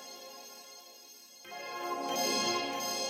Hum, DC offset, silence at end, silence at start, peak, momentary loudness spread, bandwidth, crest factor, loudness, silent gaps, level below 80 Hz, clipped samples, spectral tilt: none; under 0.1%; 0 s; 0 s; -20 dBFS; 20 LU; 16.5 kHz; 18 dB; -33 LUFS; none; -82 dBFS; under 0.1%; -1 dB/octave